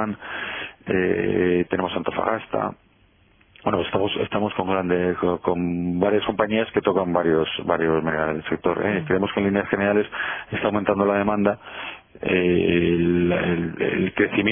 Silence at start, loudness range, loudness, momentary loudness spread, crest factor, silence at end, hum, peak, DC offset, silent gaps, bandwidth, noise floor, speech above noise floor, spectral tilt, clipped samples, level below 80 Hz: 0 s; 3 LU; -22 LUFS; 7 LU; 18 dB; 0 s; none; -4 dBFS; under 0.1%; none; 3.6 kHz; -58 dBFS; 36 dB; -10.5 dB/octave; under 0.1%; -50 dBFS